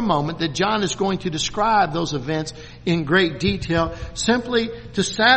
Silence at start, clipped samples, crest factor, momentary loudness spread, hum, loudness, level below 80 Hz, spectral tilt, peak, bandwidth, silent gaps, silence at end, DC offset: 0 s; under 0.1%; 20 dB; 8 LU; none; -21 LUFS; -42 dBFS; -4 dB/octave; 0 dBFS; 8.8 kHz; none; 0 s; under 0.1%